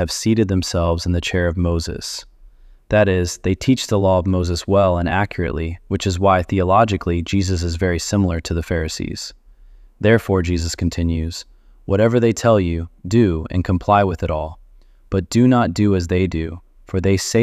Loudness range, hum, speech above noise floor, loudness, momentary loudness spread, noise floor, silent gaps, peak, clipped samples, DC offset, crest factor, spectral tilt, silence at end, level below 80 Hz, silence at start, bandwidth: 3 LU; none; 29 dB; -18 LUFS; 10 LU; -47 dBFS; none; -2 dBFS; under 0.1%; under 0.1%; 18 dB; -6 dB/octave; 0 s; -34 dBFS; 0 s; 14.5 kHz